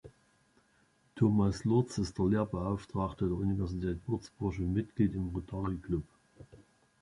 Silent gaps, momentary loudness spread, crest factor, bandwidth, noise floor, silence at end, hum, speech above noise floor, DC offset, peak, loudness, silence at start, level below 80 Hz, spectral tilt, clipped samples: none; 8 LU; 18 dB; 11.5 kHz; -70 dBFS; 0.4 s; none; 38 dB; under 0.1%; -16 dBFS; -33 LUFS; 0.05 s; -48 dBFS; -8 dB/octave; under 0.1%